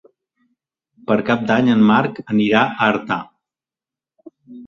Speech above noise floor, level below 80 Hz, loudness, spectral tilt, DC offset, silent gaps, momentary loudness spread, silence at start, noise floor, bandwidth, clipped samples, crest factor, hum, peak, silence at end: 74 dB; -58 dBFS; -17 LUFS; -7 dB/octave; under 0.1%; none; 10 LU; 1.1 s; -90 dBFS; 6.8 kHz; under 0.1%; 18 dB; none; 0 dBFS; 0 s